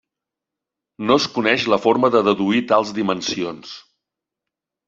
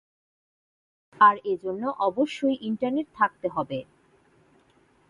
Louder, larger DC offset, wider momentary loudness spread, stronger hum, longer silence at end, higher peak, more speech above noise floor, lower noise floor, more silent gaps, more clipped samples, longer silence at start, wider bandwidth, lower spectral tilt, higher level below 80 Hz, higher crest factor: first, -18 LUFS vs -25 LUFS; neither; about the same, 12 LU vs 11 LU; neither; second, 1.05 s vs 1.25 s; first, -2 dBFS vs -6 dBFS; first, 67 dB vs 37 dB; first, -85 dBFS vs -62 dBFS; neither; neither; second, 1 s vs 1.2 s; second, 7.8 kHz vs 10.5 kHz; second, -4.5 dB/octave vs -6 dB/octave; first, -62 dBFS vs -70 dBFS; about the same, 20 dB vs 20 dB